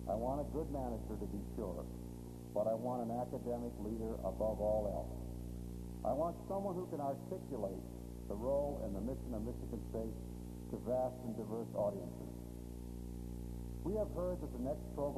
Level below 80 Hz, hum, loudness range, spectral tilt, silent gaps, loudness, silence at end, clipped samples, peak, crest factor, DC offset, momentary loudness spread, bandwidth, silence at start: -50 dBFS; 60 Hz at -50 dBFS; 3 LU; -8.5 dB/octave; none; -42 LUFS; 0 s; under 0.1%; -24 dBFS; 16 dB; under 0.1%; 10 LU; 13.5 kHz; 0 s